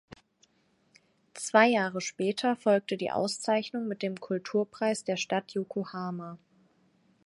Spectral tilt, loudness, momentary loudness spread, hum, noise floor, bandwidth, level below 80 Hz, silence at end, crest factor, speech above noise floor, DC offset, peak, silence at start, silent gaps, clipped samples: -4.5 dB/octave; -29 LUFS; 12 LU; none; -69 dBFS; 11.5 kHz; -76 dBFS; 0.9 s; 24 dB; 40 dB; under 0.1%; -6 dBFS; 1.35 s; none; under 0.1%